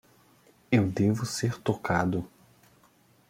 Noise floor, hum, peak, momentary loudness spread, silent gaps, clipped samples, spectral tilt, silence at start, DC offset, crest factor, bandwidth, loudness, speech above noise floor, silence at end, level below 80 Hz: -62 dBFS; none; -10 dBFS; 6 LU; none; under 0.1%; -6 dB/octave; 0.7 s; under 0.1%; 20 dB; 16.5 kHz; -28 LUFS; 36 dB; 1.05 s; -62 dBFS